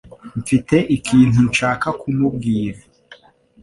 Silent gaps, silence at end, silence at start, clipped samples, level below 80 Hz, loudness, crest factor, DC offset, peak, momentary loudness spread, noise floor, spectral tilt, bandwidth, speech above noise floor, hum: none; 0.5 s; 0.05 s; under 0.1%; -44 dBFS; -17 LUFS; 16 dB; under 0.1%; -2 dBFS; 11 LU; -48 dBFS; -6 dB/octave; 11.5 kHz; 32 dB; none